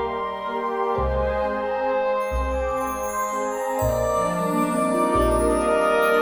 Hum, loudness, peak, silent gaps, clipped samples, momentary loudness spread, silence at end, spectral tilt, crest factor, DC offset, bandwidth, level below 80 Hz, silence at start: none; -23 LUFS; -8 dBFS; none; under 0.1%; 6 LU; 0 s; -5.5 dB/octave; 14 dB; under 0.1%; over 20 kHz; -34 dBFS; 0 s